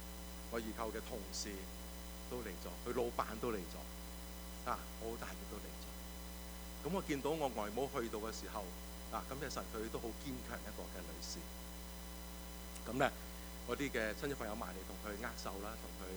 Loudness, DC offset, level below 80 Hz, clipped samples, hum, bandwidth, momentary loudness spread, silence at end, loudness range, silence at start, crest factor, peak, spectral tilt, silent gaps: -44 LUFS; under 0.1%; -52 dBFS; under 0.1%; none; over 20 kHz; 10 LU; 0 s; 4 LU; 0 s; 24 dB; -20 dBFS; -4 dB/octave; none